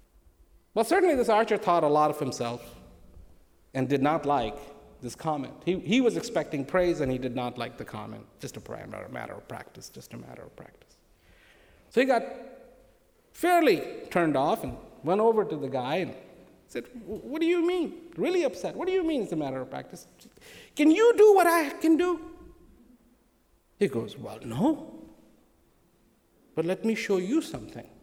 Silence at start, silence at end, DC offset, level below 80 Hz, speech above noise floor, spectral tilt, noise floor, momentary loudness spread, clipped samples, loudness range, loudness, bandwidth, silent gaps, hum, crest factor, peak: 0.75 s; 0.2 s; under 0.1%; -58 dBFS; 39 dB; -5.5 dB/octave; -66 dBFS; 19 LU; under 0.1%; 10 LU; -26 LUFS; over 20 kHz; none; none; 18 dB; -10 dBFS